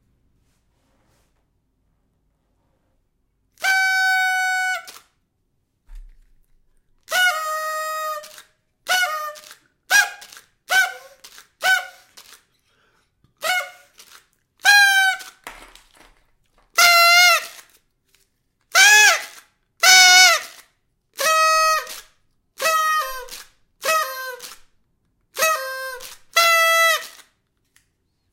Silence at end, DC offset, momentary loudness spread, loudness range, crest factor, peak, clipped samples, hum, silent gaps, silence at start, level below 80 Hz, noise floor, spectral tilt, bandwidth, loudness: 1.25 s; under 0.1%; 24 LU; 12 LU; 22 dB; 0 dBFS; under 0.1%; none; none; 3.6 s; -56 dBFS; -69 dBFS; 3.5 dB/octave; 17 kHz; -16 LUFS